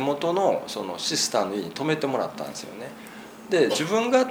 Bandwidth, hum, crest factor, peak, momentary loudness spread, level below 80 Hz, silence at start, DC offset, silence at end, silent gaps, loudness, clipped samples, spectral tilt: over 20 kHz; none; 18 dB; -6 dBFS; 17 LU; -68 dBFS; 0 s; under 0.1%; 0 s; none; -25 LUFS; under 0.1%; -3.5 dB/octave